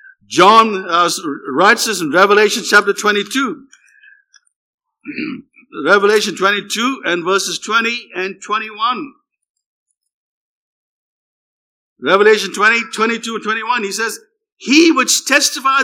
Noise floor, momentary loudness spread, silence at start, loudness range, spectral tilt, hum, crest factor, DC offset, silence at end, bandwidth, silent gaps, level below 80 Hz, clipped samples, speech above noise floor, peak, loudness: -49 dBFS; 13 LU; 0.3 s; 10 LU; -2 dB/octave; none; 16 dB; under 0.1%; 0 s; 18 kHz; 4.56-4.78 s, 9.49-9.54 s, 9.66-9.86 s, 10.13-11.96 s; -70 dBFS; under 0.1%; 35 dB; 0 dBFS; -14 LUFS